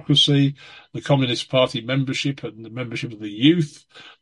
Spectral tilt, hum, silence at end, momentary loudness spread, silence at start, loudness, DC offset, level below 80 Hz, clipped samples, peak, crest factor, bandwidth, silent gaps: -5.5 dB/octave; none; 0.1 s; 16 LU; 0.1 s; -20 LUFS; under 0.1%; -60 dBFS; under 0.1%; -4 dBFS; 18 dB; 11.5 kHz; none